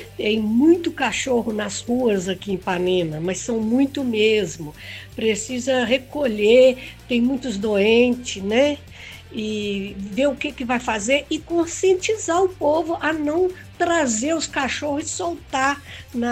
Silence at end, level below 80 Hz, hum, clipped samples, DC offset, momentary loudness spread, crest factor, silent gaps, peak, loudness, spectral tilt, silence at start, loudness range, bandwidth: 0 s; -48 dBFS; none; under 0.1%; under 0.1%; 10 LU; 16 dB; none; -4 dBFS; -21 LUFS; -4 dB/octave; 0 s; 4 LU; 15.5 kHz